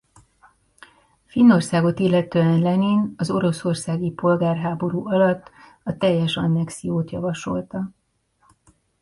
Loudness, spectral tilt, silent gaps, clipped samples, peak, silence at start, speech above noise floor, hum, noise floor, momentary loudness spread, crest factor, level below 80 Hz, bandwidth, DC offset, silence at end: -21 LUFS; -7 dB/octave; none; under 0.1%; -4 dBFS; 1.35 s; 45 dB; none; -64 dBFS; 11 LU; 18 dB; -56 dBFS; 11.5 kHz; under 0.1%; 1.1 s